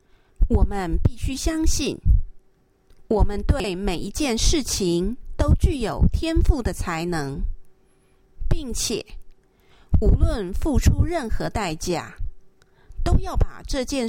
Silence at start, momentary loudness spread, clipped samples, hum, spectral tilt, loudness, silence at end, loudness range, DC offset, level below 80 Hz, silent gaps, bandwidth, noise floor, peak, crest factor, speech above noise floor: 0.4 s; 10 LU; under 0.1%; none; -5.5 dB/octave; -24 LUFS; 0 s; 4 LU; under 0.1%; -24 dBFS; none; 16.5 kHz; -59 dBFS; -4 dBFS; 18 dB; 38 dB